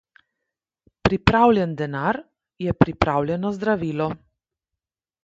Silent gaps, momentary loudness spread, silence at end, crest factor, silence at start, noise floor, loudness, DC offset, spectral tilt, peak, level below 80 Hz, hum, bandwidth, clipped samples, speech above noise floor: none; 11 LU; 1.1 s; 22 dB; 1.05 s; -87 dBFS; -22 LUFS; under 0.1%; -7.5 dB/octave; 0 dBFS; -42 dBFS; none; 7.8 kHz; under 0.1%; 66 dB